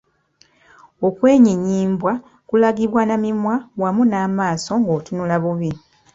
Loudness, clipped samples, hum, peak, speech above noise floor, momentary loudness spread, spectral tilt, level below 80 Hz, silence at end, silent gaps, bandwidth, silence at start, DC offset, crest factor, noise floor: -18 LUFS; under 0.1%; none; -2 dBFS; 40 dB; 9 LU; -7 dB/octave; -56 dBFS; 0.35 s; none; 7.8 kHz; 1 s; under 0.1%; 16 dB; -57 dBFS